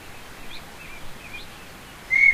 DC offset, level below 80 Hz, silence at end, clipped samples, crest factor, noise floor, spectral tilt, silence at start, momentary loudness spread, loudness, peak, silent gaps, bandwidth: under 0.1%; -48 dBFS; 0 s; under 0.1%; 20 dB; -42 dBFS; -2 dB/octave; 0 s; 19 LU; -22 LUFS; -6 dBFS; none; 16 kHz